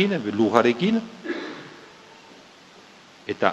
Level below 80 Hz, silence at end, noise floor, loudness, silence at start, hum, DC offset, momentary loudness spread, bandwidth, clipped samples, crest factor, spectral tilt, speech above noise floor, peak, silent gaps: -68 dBFS; 0 s; -49 dBFS; -23 LUFS; 0 s; none; under 0.1%; 21 LU; 8.4 kHz; under 0.1%; 24 dB; -6 dB/octave; 28 dB; 0 dBFS; none